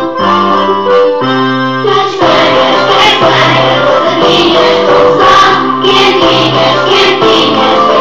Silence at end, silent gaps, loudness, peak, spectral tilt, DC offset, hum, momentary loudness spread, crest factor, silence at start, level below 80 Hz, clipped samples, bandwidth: 0 s; none; -6 LUFS; 0 dBFS; -4.5 dB/octave; 2%; none; 4 LU; 6 dB; 0 s; -42 dBFS; 0.6%; 12.5 kHz